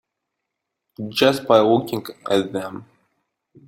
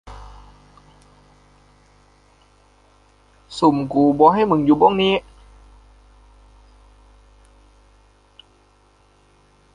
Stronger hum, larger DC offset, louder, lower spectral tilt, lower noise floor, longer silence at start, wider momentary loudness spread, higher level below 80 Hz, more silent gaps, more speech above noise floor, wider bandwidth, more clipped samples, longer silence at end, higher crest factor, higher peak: second, none vs 50 Hz at -50 dBFS; neither; second, -19 LUFS vs -16 LUFS; second, -5.5 dB/octave vs -7 dB/octave; first, -80 dBFS vs -56 dBFS; first, 1 s vs 0.05 s; about the same, 18 LU vs 20 LU; second, -64 dBFS vs -50 dBFS; neither; first, 61 dB vs 40 dB; first, 16.5 kHz vs 10 kHz; neither; second, 0.85 s vs 4.55 s; about the same, 20 dB vs 22 dB; about the same, -2 dBFS vs -2 dBFS